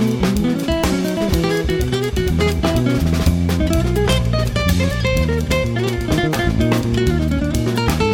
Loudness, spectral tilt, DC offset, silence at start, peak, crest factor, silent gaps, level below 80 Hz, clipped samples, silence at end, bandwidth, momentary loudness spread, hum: -18 LUFS; -6 dB/octave; under 0.1%; 0 s; -2 dBFS; 14 dB; none; -24 dBFS; under 0.1%; 0 s; 19 kHz; 2 LU; none